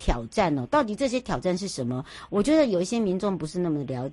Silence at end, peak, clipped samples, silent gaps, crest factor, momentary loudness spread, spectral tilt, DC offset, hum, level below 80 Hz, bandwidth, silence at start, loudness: 0 s; -8 dBFS; under 0.1%; none; 18 dB; 8 LU; -6 dB/octave; under 0.1%; none; -38 dBFS; 11.5 kHz; 0 s; -26 LUFS